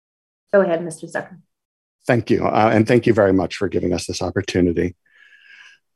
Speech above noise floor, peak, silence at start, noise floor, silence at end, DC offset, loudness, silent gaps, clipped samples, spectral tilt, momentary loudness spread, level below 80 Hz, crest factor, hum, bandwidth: 31 dB; -2 dBFS; 0.55 s; -49 dBFS; 1.05 s; under 0.1%; -19 LUFS; 1.65-1.99 s; under 0.1%; -6 dB/octave; 12 LU; -56 dBFS; 18 dB; none; 12.5 kHz